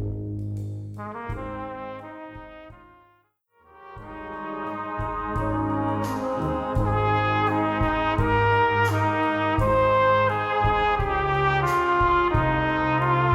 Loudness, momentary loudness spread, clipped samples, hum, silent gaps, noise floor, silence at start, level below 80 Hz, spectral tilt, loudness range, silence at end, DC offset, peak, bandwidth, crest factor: -23 LUFS; 15 LU; under 0.1%; none; none; -64 dBFS; 0 s; -38 dBFS; -7 dB/octave; 16 LU; 0 s; under 0.1%; -10 dBFS; 13 kHz; 14 dB